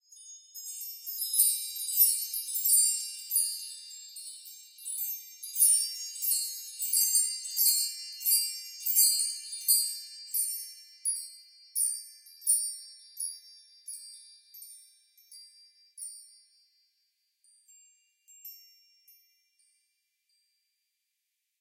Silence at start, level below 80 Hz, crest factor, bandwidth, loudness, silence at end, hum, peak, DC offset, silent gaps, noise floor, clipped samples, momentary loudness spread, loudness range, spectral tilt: 0.1 s; under -90 dBFS; 24 dB; 16.5 kHz; -27 LUFS; 3 s; none; -8 dBFS; under 0.1%; none; -83 dBFS; under 0.1%; 24 LU; 21 LU; 12.5 dB/octave